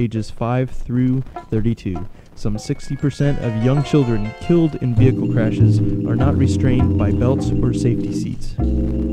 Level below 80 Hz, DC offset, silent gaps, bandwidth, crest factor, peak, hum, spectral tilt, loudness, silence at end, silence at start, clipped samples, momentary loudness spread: -28 dBFS; under 0.1%; none; 9.8 kHz; 16 dB; -2 dBFS; none; -8.5 dB/octave; -19 LUFS; 0 s; 0 s; under 0.1%; 10 LU